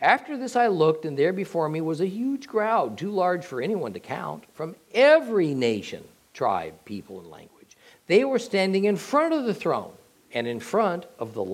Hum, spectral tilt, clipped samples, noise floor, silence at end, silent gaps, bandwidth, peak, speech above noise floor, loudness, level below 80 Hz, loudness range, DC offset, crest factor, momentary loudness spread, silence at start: none; -5.5 dB/octave; under 0.1%; -54 dBFS; 0 s; none; 16 kHz; -4 dBFS; 30 dB; -24 LUFS; -74 dBFS; 3 LU; under 0.1%; 20 dB; 16 LU; 0 s